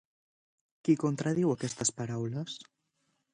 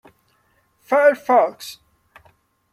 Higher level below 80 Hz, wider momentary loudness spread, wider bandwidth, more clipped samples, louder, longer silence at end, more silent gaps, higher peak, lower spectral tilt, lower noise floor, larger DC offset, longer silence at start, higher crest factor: about the same, -70 dBFS vs -70 dBFS; second, 10 LU vs 20 LU; second, 10.5 kHz vs 15 kHz; neither; second, -31 LUFS vs -17 LUFS; second, 0.7 s vs 1 s; neither; second, -14 dBFS vs -4 dBFS; first, -5 dB/octave vs -3.5 dB/octave; first, -78 dBFS vs -63 dBFS; neither; about the same, 0.85 s vs 0.9 s; about the same, 20 dB vs 18 dB